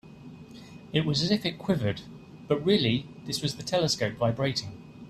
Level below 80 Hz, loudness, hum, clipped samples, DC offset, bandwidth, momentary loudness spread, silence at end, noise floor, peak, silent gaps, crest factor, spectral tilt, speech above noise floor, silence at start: -58 dBFS; -28 LUFS; none; under 0.1%; under 0.1%; 14 kHz; 22 LU; 0 s; -47 dBFS; -10 dBFS; none; 18 dB; -5 dB/octave; 19 dB; 0.05 s